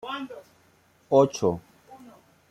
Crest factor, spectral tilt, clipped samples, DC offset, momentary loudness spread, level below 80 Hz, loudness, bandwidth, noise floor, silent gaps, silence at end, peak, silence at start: 24 dB; -6 dB/octave; under 0.1%; under 0.1%; 19 LU; -64 dBFS; -25 LUFS; 13.5 kHz; -61 dBFS; none; 0.55 s; -4 dBFS; 0.05 s